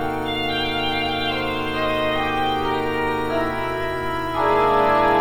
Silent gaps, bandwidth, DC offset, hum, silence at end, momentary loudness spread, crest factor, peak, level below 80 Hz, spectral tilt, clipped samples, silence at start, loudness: none; over 20 kHz; 1%; none; 0 s; 7 LU; 14 dB; -8 dBFS; -40 dBFS; -5.5 dB/octave; under 0.1%; 0 s; -21 LUFS